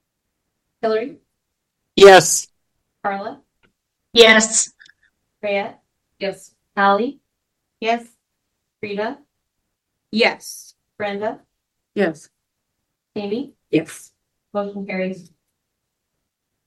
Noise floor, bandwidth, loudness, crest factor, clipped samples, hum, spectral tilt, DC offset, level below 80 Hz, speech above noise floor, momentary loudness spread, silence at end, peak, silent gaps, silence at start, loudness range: -77 dBFS; 14.5 kHz; -17 LUFS; 20 dB; under 0.1%; none; -2.5 dB/octave; under 0.1%; -56 dBFS; 60 dB; 24 LU; 1.45 s; 0 dBFS; none; 0.85 s; 13 LU